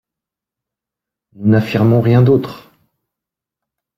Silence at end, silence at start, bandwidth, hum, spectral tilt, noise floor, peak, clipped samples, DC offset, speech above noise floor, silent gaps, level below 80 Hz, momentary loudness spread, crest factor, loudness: 1.4 s; 1.4 s; 13.5 kHz; none; -9.5 dB/octave; -85 dBFS; -2 dBFS; under 0.1%; under 0.1%; 73 dB; none; -52 dBFS; 8 LU; 16 dB; -13 LUFS